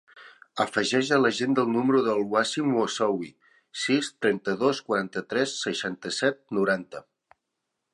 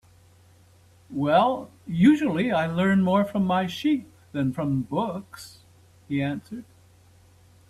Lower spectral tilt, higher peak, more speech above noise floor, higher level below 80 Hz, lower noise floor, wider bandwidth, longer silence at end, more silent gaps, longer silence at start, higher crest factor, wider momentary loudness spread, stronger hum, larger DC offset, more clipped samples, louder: second, -4 dB/octave vs -7.5 dB/octave; about the same, -8 dBFS vs -6 dBFS; first, 57 dB vs 32 dB; second, -72 dBFS vs -60 dBFS; first, -82 dBFS vs -55 dBFS; second, 11.5 kHz vs 13 kHz; second, 0.9 s vs 1.05 s; neither; second, 0.15 s vs 1.1 s; about the same, 18 dB vs 20 dB; second, 8 LU vs 16 LU; neither; neither; neither; about the same, -26 LUFS vs -24 LUFS